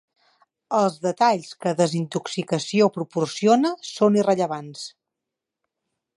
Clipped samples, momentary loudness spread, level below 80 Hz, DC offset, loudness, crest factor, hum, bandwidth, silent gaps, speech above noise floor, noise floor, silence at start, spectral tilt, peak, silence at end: under 0.1%; 9 LU; -72 dBFS; under 0.1%; -22 LUFS; 20 dB; none; 11.5 kHz; none; 63 dB; -85 dBFS; 0.7 s; -5.5 dB/octave; -4 dBFS; 1.3 s